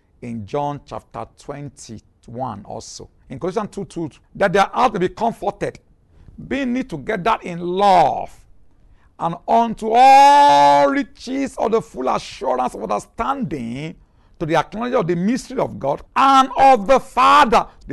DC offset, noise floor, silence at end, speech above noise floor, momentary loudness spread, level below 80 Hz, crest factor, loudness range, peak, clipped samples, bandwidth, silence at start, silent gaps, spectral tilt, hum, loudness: under 0.1%; -50 dBFS; 0 s; 33 dB; 21 LU; -48 dBFS; 14 dB; 13 LU; -4 dBFS; under 0.1%; 12.5 kHz; 0.25 s; none; -5 dB/octave; none; -17 LUFS